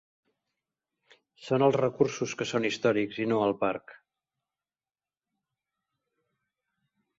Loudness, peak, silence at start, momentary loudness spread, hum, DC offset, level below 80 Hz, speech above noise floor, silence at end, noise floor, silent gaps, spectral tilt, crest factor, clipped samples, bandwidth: -28 LUFS; -10 dBFS; 1.4 s; 7 LU; none; under 0.1%; -72 dBFS; over 63 dB; 3.25 s; under -90 dBFS; none; -5.5 dB/octave; 22 dB; under 0.1%; 8 kHz